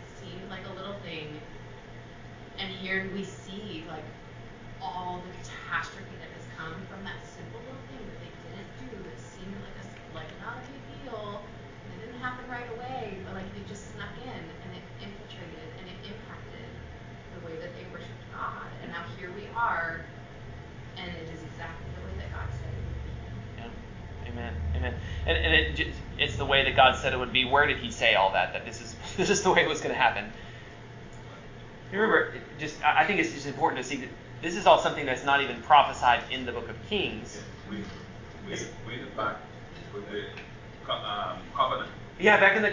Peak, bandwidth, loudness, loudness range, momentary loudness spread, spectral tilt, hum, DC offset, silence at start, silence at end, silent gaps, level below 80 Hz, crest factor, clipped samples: -6 dBFS; 7.6 kHz; -28 LUFS; 18 LU; 22 LU; -4 dB/octave; none; under 0.1%; 0 s; 0 s; none; -46 dBFS; 24 dB; under 0.1%